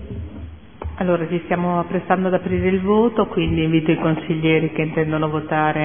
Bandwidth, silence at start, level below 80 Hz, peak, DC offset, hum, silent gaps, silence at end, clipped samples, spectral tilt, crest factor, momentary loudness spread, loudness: 3.6 kHz; 0 s; -40 dBFS; 0 dBFS; 0.5%; none; none; 0 s; under 0.1%; -11.5 dB/octave; 18 dB; 15 LU; -19 LUFS